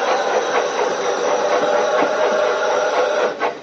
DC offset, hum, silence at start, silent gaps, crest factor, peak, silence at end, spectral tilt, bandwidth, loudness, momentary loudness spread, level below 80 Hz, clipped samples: under 0.1%; none; 0 s; none; 14 dB; -4 dBFS; 0 s; -0.5 dB/octave; 8 kHz; -18 LUFS; 3 LU; -70 dBFS; under 0.1%